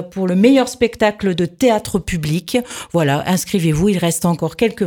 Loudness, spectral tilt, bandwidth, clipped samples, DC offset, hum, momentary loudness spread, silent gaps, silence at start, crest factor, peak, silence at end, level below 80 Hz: -17 LUFS; -5.5 dB/octave; 18.5 kHz; under 0.1%; under 0.1%; none; 7 LU; none; 0 s; 16 dB; 0 dBFS; 0 s; -40 dBFS